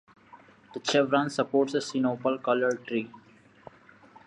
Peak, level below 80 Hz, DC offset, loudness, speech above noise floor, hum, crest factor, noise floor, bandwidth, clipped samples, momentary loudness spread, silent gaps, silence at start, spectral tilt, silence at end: -10 dBFS; -76 dBFS; under 0.1%; -27 LUFS; 28 dB; none; 18 dB; -55 dBFS; 11 kHz; under 0.1%; 9 LU; none; 0.35 s; -4.5 dB/octave; 1.1 s